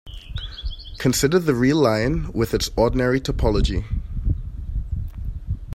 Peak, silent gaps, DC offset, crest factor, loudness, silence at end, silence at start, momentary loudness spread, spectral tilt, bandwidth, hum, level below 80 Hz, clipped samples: -4 dBFS; none; under 0.1%; 18 dB; -22 LUFS; 0 s; 0.05 s; 15 LU; -5.5 dB/octave; 16 kHz; none; -28 dBFS; under 0.1%